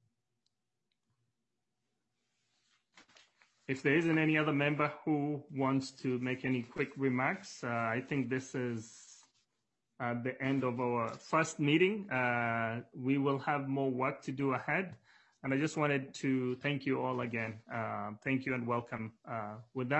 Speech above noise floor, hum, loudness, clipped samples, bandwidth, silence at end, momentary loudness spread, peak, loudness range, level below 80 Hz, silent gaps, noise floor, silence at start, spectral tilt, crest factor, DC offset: 53 dB; none; -34 LUFS; under 0.1%; 8.2 kHz; 0 s; 11 LU; -16 dBFS; 5 LU; -78 dBFS; none; -88 dBFS; 2.95 s; -6 dB/octave; 20 dB; under 0.1%